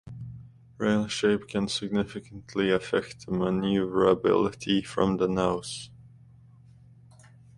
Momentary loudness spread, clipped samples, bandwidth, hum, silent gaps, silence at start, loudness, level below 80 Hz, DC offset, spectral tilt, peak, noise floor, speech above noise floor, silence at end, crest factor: 16 LU; under 0.1%; 11.5 kHz; none; none; 0.05 s; -27 LUFS; -54 dBFS; under 0.1%; -5.5 dB/octave; -8 dBFS; -53 dBFS; 27 dB; 1.55 s; 20 dB